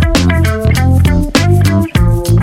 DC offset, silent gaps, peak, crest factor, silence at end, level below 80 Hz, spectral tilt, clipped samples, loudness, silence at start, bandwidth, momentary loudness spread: under 0.1%; none; 0 dBFS; 8 dB; 0 s; -18 dBFS; -6 dB/octave; under 0.1%; -11 LUFS; 0 s; 16 kHz; 2 LU